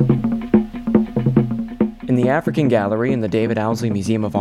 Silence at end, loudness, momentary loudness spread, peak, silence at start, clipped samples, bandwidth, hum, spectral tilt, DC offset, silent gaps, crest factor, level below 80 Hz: 0 s; -19 LUFS; 4 LU; -2 dBFS; 0 s; under 0.1%; 12 kHz; none; -8 dB/octave; under 0.1%; none; 16 dB; -42 dBFS